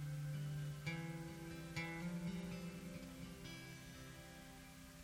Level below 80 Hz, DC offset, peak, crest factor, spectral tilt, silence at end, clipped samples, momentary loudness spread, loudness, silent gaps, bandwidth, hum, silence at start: -66 dBFS; under 0.1%; -30 dBFS; 18 dB; -5.5 dB/octave; 0 s; under 0.1%; 10 LU; -49 LUFS; none; 17.5 kHz; none; 0 s